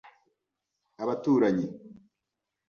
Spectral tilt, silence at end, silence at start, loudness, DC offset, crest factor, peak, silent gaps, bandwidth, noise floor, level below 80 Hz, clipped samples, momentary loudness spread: -8 dB/octave; 0.75 s; 1 s; -28 LUFS; under 0.1%; 18 dB; -14 dBFS; none; 6.8 kHz; -86 dBFS; -72 dBFS; under 0.1%; 13 LU